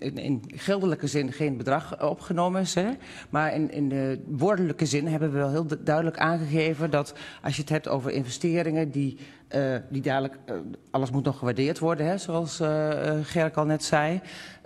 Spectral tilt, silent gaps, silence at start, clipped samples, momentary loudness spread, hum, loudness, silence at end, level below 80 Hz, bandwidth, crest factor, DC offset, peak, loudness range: -6 dB/octave; none; 0 s; under 0.1%; 6 LU; none; -27 LUFS; 0.1 s; -62 dBFS; 13 kHz; 20 dB; under 0.1%; -8 dBFS; 3 LU